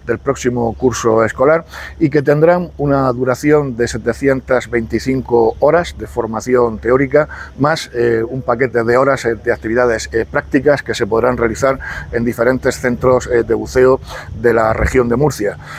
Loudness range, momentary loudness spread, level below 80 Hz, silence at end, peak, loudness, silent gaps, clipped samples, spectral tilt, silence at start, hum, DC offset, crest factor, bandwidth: 1 LU; 6 LU; -34 dBFS; 0 s; 0 dBFS; -15 LUFS; none; under 0.1%; -6 dB/octave; 0.05 s; none; under 0.1%; 14 dB; 15.5 kHz